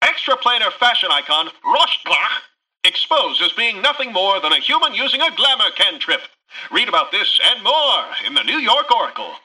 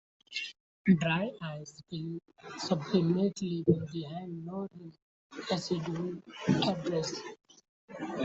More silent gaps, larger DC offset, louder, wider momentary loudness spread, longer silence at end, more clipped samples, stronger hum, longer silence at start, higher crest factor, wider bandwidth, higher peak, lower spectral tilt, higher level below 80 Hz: second, none vs 0.60-0.85 s, 5.02-5.30 s, 7.69-7.88 s; neither; first, -15 LUFS vs -33 LUFS; second, 5 LU vs 16 LU; about the same, 0.1 s vs 0 s; neither; neither; second, 0 s vs 0.3 s; second, 14 dB vs 22 dB; first, 11 kHz vs 8 kHz; first, -4 dBFS vs -10 dBFS; second, -0.5 dB/octave vs -6 dB/octave; about the same, -66 dBFS vs -68 dBFS